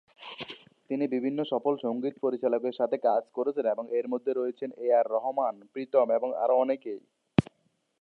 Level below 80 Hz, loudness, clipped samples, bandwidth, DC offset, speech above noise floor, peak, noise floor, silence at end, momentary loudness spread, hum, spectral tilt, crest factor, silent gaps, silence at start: -64 dBFS; -29 LUFS; under 0.1%; 6.2 kHz; under 0.1%; 45 dB; -6 dBFS; -73 dBFS; 0.6 s; 15 LU; none; -8.5 dB/octave; 22 dB; none; 0.2 s